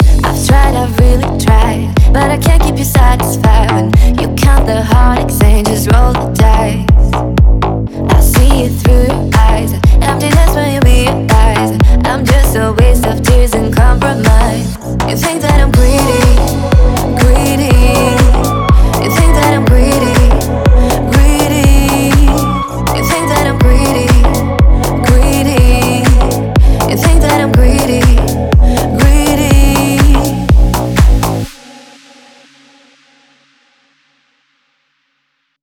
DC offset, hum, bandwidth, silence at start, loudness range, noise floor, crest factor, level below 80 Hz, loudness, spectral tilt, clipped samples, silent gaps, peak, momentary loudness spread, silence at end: under 0.1%; none; 18 kHz; 0 s; 1 LU; -63 dBFS; 8 dB; -10 dBFS; -10 LUFS; -5.5 dB/octave; 0.4%; none; 0 dBFS; 3 LU; 4.1 s